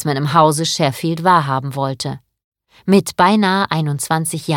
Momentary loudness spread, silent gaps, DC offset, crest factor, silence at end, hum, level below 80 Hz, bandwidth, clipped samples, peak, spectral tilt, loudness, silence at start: 10 LU; 2.44-2.52 s; under 0.1%; 16 dB; 0 s; none; -56 dBFS; 17.5 kHz; under 0.1%; 0 dBFS; -5 dB/octave; -16 LUFS; 0 s